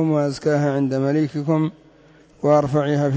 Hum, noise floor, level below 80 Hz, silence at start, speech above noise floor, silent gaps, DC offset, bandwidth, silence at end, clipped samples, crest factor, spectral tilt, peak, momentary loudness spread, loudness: none; -51 dBFS; -56 dBFS; 0 s; 32 dB; none; under 0.1%; 8 kHz; 0 s; under 0.1%; 14 dB; -8 dB/octave; -6 dBFS; 4 LU; -20 LUFS